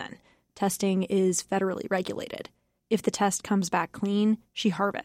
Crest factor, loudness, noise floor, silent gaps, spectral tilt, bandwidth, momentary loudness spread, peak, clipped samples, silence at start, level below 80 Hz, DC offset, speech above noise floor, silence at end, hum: 16 dB; -27 LUFS; -51 dBFS; none; -4.5 dB/octave; 15.5 kHz; 10 LU; -12 dBFS; under 0.1%; 0 s; -66 dBFS; under 0.1%; 24 dB; 0 s; none